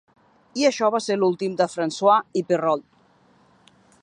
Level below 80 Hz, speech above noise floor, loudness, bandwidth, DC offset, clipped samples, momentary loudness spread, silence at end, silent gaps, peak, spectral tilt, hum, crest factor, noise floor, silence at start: -72 dBFS; 37 dB; -22 LUFS; 11 kHz; under 0.1%; under 0.1%; 6 LU; 1.2 s; none; -4 dBFS; -4.5 dB/octave; none; 18 dB; -58 dBFS; 0.55 s